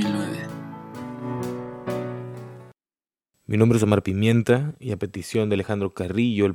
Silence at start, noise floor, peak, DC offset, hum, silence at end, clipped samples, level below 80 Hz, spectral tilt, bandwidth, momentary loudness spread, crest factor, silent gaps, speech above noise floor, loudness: 0 s; under -90 dBFS; -2 dBFS; under 0.1%; none; 0 s; under 0.1%; -56 dBFS; -7 dB/octave; 16 kHz; 17 LU; 22 dB; none; over 69 dB; -24 LUFS